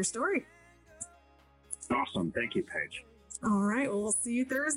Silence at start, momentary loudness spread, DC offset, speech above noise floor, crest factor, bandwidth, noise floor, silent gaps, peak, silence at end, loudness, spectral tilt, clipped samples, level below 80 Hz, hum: 0 s; 16 LU; under 0.1%; 30 dB; 14 dB; 15.5 kHz; -62 dBFS; none; -18 dBFS; 0 s; -32 LUFS; -4 dB/octave; under 0.1%; -64 dBFS; none